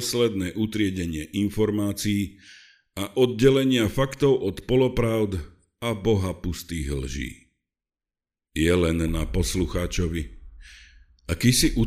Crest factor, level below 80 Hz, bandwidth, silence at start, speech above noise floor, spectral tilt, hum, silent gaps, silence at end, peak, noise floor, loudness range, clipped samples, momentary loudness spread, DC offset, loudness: 20 dB; -36 dBFS; 15.5 kHz; 0 s; over 67 dB; -5.5 dB/octave; none; none; 0 s; -4 dBFS; under -90 dBFS; 5 LU; under 0.1%; 13 LU; under 0.1%; -24 LUFS